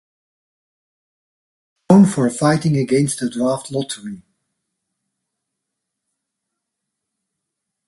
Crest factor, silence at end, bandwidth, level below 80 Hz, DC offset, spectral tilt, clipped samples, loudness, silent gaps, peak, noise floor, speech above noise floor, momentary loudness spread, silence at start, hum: 22 dB; 3.7 s; 11.5 kHz; -58 dBFS; under 0.1%; -6.5 dB/octave; under 0.1%; -17 LUFS; none; 0 dBFS; -80 dBFS; 63 dB; 14 LU; 1.9 s; none